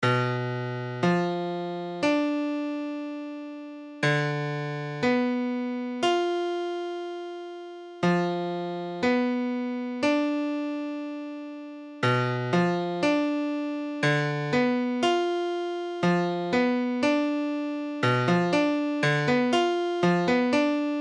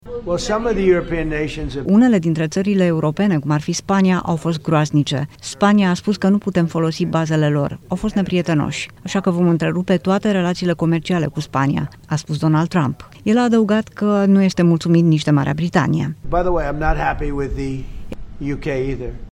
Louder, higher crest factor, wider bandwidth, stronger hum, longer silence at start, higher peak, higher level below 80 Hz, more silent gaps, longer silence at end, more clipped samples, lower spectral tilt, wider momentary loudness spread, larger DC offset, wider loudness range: second, -26 LUFS vs -18 LUFS; about the same, 14 dB vs 16 dB; about the same, 10.5 kHz vs 11.5 kHz; neither; about the same, 0 s vs 0.05 s; second, -12 dBFS vs 0 dBFS; second, -70 dBFS vs -34 dBFS; neither; about the same, 0 s vs 0 s; neither; about the same, -6.5 dB/octave vs -6.5 dB/octave; about the same, 11 LU vs 10 LU; neither; about the same, 4 LU vs 3 LU